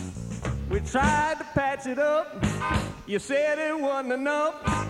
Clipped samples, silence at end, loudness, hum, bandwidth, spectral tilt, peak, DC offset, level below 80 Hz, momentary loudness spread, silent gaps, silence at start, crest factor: under 0.1%; 0 s; -27 LUFS; none; 13.5 kHz; -5.5 dB/octave; -8 dBFS; under 0.1%; -40 dBFS; 8 LU; none; 0 s; 18 dB